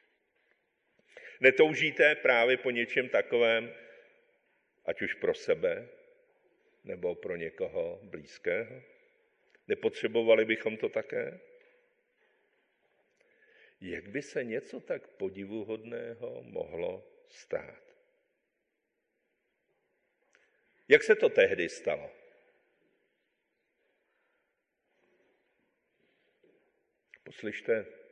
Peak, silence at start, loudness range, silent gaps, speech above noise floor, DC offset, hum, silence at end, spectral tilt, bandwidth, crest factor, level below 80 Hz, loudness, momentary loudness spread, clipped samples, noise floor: -8 dBFS; 1.15 s; 16 LU; none; 52 dB; under 0.1%; none; 0.15 s; -4.5 dB/octave; 9.6 kHz; 26 dB; -74 dBFS; -30 LUFS; 17 LU; under 0.1%; -82 dBFS